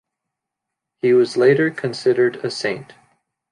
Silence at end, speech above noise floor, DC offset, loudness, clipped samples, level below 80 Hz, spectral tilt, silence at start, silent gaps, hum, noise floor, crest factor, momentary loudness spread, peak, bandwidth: 0.7 s; 65 dB; under 0.1%; -18 LUFS; under 0.1%; -70 dBFS; -6 dB/octave; 1.05 s; none; none; -82 dBFS; 16 dB; 9 LU; -4 dBFS; 10.5 kHz